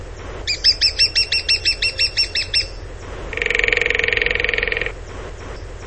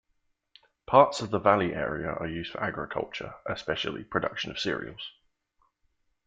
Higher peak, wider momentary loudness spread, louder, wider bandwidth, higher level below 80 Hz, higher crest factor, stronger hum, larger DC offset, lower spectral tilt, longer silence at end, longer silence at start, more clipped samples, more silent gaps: first, 0 dBFS vs -4 dBFS; first, 19 LU vs 14 LU; first, -16 LUFS vs -28 LUFS; about the same, 8.8 kHz vs 9.2 kHz; first, -34 dBFS vs -58 dBFS; second, 20 dB vs 26 dB; neither; first, 0.6% vs under 0.1%; second, -1.5 dB/octave vs -5 dB/octave; second, 0 s vs 1.15 s; second, 0 s vs 0.9 s; neither; neither